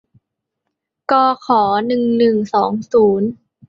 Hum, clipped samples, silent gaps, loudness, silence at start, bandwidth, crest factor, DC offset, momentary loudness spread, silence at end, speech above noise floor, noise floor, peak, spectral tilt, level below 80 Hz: none; under 0.1%; none; -15 LUFS; 1.1 s; 7.2 kHz; 14 dB; under 0.1%; 5 LU; 0.35 s; 62 dB; -77 dBFS; -2 dBFS; -7 dB/octave; -58 dBFS